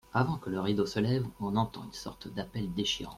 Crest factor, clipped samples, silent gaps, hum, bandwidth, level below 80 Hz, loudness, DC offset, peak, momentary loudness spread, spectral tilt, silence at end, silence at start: 18 dB; under 0.1%; none; none; 15.5 kHz; -56 dBFS; -33 LUFS; under 0.1%; -14 dBFS; 11 LU; -5.5 dB/octave; 0 s; 0.15 s